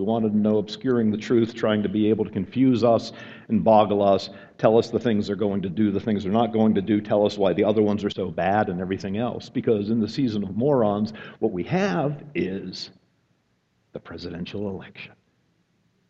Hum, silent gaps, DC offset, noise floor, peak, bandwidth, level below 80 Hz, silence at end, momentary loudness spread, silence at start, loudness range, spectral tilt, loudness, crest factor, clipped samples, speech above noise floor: none; none; under 0.1%; -68 dBFS; -4 dBFS; 7.6 kHz; -58 dBFS; 1 s; 14 LU; 0 s; 8 LU; -7.5 dB/octave; -23 LUFS; 20 dB; under 0.1%; 46 dB